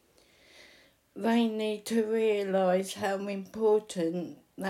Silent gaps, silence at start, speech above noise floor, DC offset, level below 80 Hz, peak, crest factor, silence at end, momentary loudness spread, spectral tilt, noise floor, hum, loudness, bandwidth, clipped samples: none; 1.15 s; 34 dB; under 0.1%; -76 dBFS; -16 dBFS; 14 dB; 0 s; 7 LU; -5.5 dB/octave; -62 dBFS; none; -29 LUFS; 16 kHz; under 0.1%